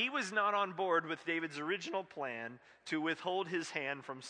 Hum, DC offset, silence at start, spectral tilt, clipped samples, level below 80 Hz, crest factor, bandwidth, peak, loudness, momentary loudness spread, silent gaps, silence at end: none; under 0.1%; 0 s; -4 dB/octave; under 0.1%; -88 dBFS; 18 dB; 10 kHz; -18 dBFS; -37 LUFS; 8 LU; none; 0 s